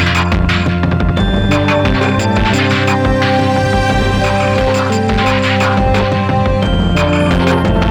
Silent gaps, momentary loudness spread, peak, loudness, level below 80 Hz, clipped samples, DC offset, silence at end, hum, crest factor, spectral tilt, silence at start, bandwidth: none; 2 LU; 0 dBFS; -13 LUFS; -22 dBFS; under 0.1%; under 0.1%; 0 s; none; 12 dB; -6 dB/octave; 0 s; 12 kHz